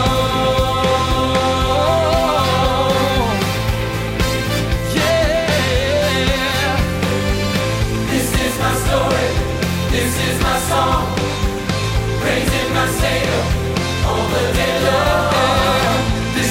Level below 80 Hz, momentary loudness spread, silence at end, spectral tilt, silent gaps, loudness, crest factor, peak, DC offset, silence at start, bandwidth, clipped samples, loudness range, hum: -26 dBFS; 4 LU; 0 s; -4.5 dB/octave; none; -17 LUFS; 12 dB; -4 dBFS; under 0.1%; 0 s; 16.5 kHz; under 0.1%; 2 LU; none